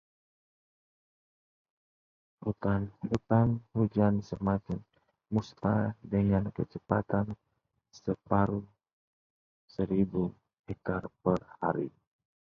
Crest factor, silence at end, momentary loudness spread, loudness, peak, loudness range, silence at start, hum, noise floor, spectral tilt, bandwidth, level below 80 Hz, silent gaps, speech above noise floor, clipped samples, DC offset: 24 dB; 0.55 s; 12 LU; -32 LUFS; -10 dBFS; 4 LU; 2.4 s; none; under -90 dBFS; -9.5 dB/octave; 7 kHz; -54 dBFS; 8.93-9.68 s, 10.59-10.64 s; over 60 dB; under 0.1%; under 0.1%